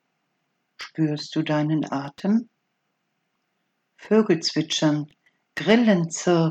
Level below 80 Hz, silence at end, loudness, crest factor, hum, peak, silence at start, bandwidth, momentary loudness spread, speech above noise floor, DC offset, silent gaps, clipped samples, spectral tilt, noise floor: -70 dBFS; 0 s; -23 LUFS; 20 dB; none; -4 dBFS; 0.8 s; 9 kHz; 11 LU; 53 dB; under 0.1%; none; under 0.1%; -5.5 dB/octave; -75 dBFS